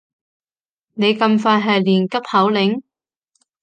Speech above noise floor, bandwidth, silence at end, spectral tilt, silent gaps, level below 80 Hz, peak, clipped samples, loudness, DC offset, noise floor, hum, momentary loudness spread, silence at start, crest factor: over 74 dB; 8.8 kHz; 0.8 s; -6.5 dB/octave; none; -68 dBFS; -2 dBFS; under 0.1%; -16 LUFS; under 0.1%; under -90 dBFS; none; 5 LU; 0.95 s; 16 dB